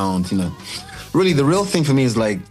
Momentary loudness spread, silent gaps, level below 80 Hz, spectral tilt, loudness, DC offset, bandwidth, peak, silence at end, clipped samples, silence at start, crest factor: 14 LU; none; -46 dBFS; -6 dB/octave; -18 LUFS; under 0.1%; 15 kHz; -6 dBFS; 0.05 s; under 0.1%; 0 s; 12 dB